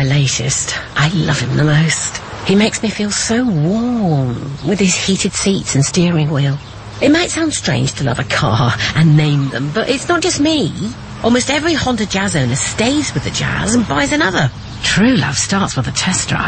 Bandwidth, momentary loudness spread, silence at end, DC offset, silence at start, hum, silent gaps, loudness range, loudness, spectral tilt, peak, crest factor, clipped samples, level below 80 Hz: 8.8 kHz; 6 LU; 0 s; under 0.1%; 0 s; none; none; 1 LU; -15 LUFS; -4.5 dB/octave; 0 dBFS; 14 dB; under 0.1%; -36 dBFS